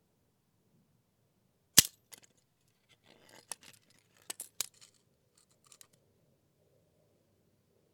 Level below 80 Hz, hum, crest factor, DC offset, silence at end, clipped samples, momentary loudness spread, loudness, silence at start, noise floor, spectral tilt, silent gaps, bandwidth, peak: -70 dBFS; none; 36 dB; under 0.1%; 3.5 s; under 0.1%; 23 LU; -28 LUFS; 1.75 s; -75 dBFS; 0 dB/octave; none; 19.5 kHz; -4 dBFS